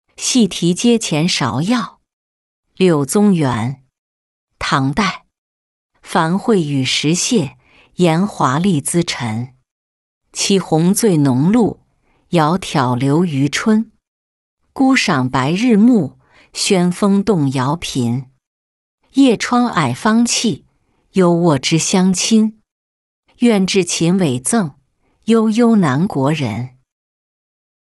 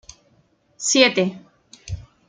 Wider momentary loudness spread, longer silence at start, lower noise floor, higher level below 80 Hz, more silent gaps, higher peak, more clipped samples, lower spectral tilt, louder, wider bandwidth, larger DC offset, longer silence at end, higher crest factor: second, 9 LU vs 20 LU; second, 0.2 s vs 0.8 s; about the same, -59 dBFS vs -61 dBFS; about the same, -50 dBFS vs -50 dBFS; first, 2.13-2.63 s, 3.98-4.48 s, 5.38-5.90 s, 9.71-10.21 s, 14.08-14.57 s, 18.47-18.98 s, 22.71-23.23 s vs none; about the same, -2 dBFS vs -2 dBFS; neither; first, -5 dB/octave vs -2.5 dB/octave; first, -15 LUFS vs -18 LUFS; first, 12 kHz vs 9.6 kHz; neither; first, 1.15 s vs 0.25 s; second, 14 dB vs 22 dB